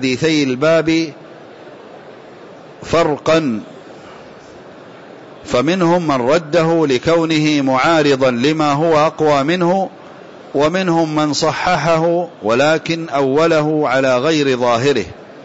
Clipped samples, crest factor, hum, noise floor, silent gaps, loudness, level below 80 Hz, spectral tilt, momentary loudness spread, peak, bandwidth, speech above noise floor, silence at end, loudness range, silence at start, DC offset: under 0.1%; 12 dB; none; -37 dBFS; none; -15 LUFS; -50 dBFS; -5.5 dB/octave; 6 LU; -4 dBFS; 8 kHz; 23 dB; 0 s; 7 LU; 0 s; under 0.1%